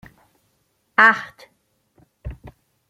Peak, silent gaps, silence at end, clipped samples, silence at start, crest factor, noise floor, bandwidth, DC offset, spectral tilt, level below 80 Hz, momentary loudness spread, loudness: -2 dBFS; none; 0.4 s; under 0.1%; 1 s; 22 dB; -68 dBFS; 15.5 kHz; under 0.1%; -4.5 dB/octave; -46 dBFS; 25 LU; -16 LUFS